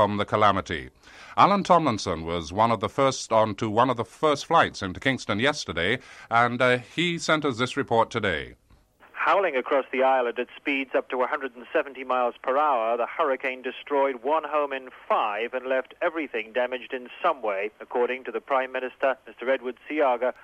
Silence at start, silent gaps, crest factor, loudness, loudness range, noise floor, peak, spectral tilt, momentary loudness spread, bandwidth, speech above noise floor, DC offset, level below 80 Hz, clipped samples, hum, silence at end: 0 s; none; 20 dB; -25 LUFS; 5 LU; -57 dBFS; -6 dBFS; -5 dB/octave; 9 LU; 12 kHz; 32 dB; under 0.1%; -56 dBFS; under 0.1%; none; 0.1 s